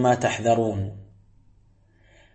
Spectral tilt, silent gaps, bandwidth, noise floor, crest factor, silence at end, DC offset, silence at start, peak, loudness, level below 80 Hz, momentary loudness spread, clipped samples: -6 dB/octave; none; 8.6 kHz; -58 dBFS; 16 dB; 1.3 s; under 0.1%; 0 s; -10 dBFS; -24 LUFS; -56 dBFS; 14 LU; under 0.1%